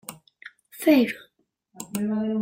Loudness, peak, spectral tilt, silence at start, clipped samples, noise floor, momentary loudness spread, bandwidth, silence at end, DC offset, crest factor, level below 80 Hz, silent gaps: -23 LUFS; -6 dBFS; -5 dB/octave; 0.1 s; under 0.1%; -68 dBFS; 23 LU; 16.5 kHz; 0 s; under 0.1%; 20 dB; -70 dBFS; none